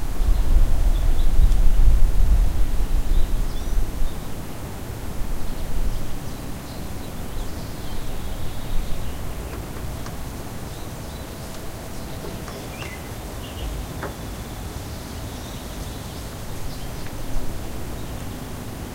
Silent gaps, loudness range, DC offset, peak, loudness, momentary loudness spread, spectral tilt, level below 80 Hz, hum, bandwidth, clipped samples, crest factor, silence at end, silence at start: none; 9 LU; under 0.1%; -2 dBFS; -29 LUFS; 11 LU; -5.5 dB/octave; -22 dBFS; none; 16 kHz; under 0.1%; 18 dB; 0 s; 0 s